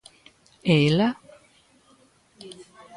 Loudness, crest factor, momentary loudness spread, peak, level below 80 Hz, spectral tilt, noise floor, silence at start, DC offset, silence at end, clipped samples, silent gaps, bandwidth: -22 LUFS; 20 dB; 25 LU; -8 dBFS; -60 dBFS; -6.5 dB/octave; -59 dBFS; 0.65 s; under 0.1%; 0.35 s; under 0.1%; none; 11 kHz